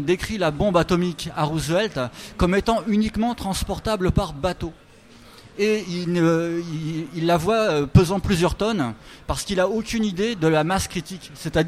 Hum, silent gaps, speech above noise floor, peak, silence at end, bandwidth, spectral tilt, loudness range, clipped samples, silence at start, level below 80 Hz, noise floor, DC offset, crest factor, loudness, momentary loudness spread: none; none; 26 dB; 0 dBFS; 0 s; 15.5 kHz; -5.5 dB/octave; 4 LU; under 0.1%; 0 s; -38 dBFS; -47 dBFS; under 0.1%; 22 dB; -22 LUFS; 9 LU